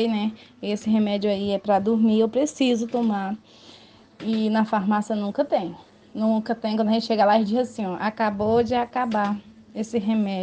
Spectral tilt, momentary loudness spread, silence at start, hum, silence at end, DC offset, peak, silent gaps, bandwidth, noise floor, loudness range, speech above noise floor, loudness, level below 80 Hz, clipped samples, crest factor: -6 dB/octave; 10 LU; 0 s; none; 0 s; under 0.1%; -6 dBFS; none; 9 kHz; -50 dBFS; 3 LU; 28 dB; -23 LUFS; -62 dBFS; under 0.1%; 16 dB